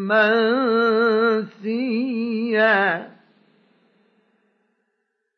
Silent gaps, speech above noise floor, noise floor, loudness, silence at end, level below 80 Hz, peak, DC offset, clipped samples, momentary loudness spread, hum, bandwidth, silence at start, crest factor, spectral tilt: none; 55 dB; -74 dBFS; -19 LUFS; 2.3 s; -86 dBFS; -6 dBFS; under 0.1%; under 0.1%; 8 LU; none; 5.8 kHz; 0 s; 16 dB; -7.5 dB/octave